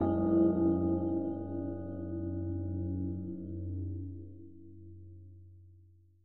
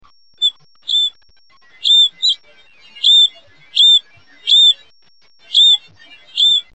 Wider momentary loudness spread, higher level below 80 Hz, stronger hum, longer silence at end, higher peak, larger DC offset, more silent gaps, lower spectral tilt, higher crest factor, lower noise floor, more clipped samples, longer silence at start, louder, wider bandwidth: first, 25 LU vs 12 LU; first, -60 dBFS vs -68 dBFS; neither; second, 0 s vs 0.15 s; second, -18 dBFS vs -2 dBFS; about the same, 0.2% vs 0.4%; neither; first, -13.5 dB/octave vs 3.5 dB/octave; about the same, 16 dB vs 12 dB; first, -61 dBFS vs -55 dBFS; neither; second, 0 s vs 0.4 s; second, -34 LUFS vs -11 LUFS; second, 1.8 kHz vs 8.4 kHz